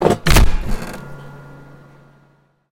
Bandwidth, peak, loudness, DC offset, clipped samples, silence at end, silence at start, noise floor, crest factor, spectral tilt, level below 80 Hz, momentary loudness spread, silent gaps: 17 kHz; 0 dBFS; -18 LUFS; under 0.1%; under 0.1%; 1.1 s; 0 s; -56 dBFS; 16 dB; -5 dB/octave; -22 dBFS; 26 LU; none